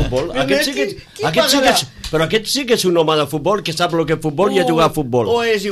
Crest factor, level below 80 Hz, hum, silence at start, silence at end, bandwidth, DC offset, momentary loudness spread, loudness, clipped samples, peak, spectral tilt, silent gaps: 14 dB; -38 dBFS; none; 0 s; 0 s; 15.5 kHz; under 0.1%; 6 LU; -16 LUFS; under 0.1%; -2 dBFS; -4 dB/octave; none